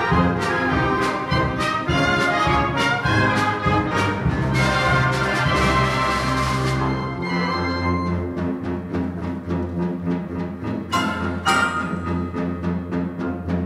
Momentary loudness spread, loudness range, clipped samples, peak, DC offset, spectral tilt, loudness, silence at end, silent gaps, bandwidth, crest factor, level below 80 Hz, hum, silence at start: 8 LU; 5 LU; under 0.1%; -6 dBFS; under 0.1%; -5.5 dB/octave; -21 LUFS; 0 s; none; 14.5 kHz; 16 dB; -36 dBFS; none; 0 s